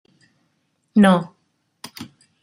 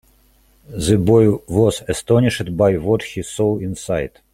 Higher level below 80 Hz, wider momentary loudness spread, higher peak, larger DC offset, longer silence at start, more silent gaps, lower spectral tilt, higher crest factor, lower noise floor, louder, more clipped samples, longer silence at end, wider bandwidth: second, -64 dBFS vs -42 dBFS; first, 26 LU vs 10 LU; about the same, -2 dBFS vs -2 dBFS; neither; first, 0.95 s vs 0.7 s; neither; about the same, -7 dB/octave vs -6.5 dB/octave; about the same, 20 dB vs 16 dB; first, -69 dBFS vs -54 dBFS; about the same, -17 LUFS vs -18 LUFS; neither; first, 0.4 s vs 0.25 s; about the same, 14.5 kHz vs 15.5 kHz